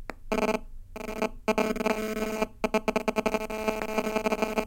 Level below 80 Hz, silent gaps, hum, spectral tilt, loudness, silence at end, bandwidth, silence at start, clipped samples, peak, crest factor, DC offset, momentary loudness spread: -46 dBFS; none; none; -4.5 dB/octave; -29 LUFS; 0 s; 17 kHz; 0 s; under 0.1%; -10 dBFS; 20 dB; under 0.1%; 5 LU